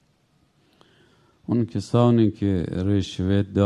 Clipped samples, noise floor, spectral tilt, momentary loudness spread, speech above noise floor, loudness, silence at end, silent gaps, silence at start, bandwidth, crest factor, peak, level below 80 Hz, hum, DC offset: under 0.1%; -64 dBFS; -8 dB/octave; 7 LU; 43 dB; -22 LUFS; 0 s; none; 1.5 s; 10.5 kHz; 18 dB; -6 dBFS; -42 dBFS; none; under 0.1%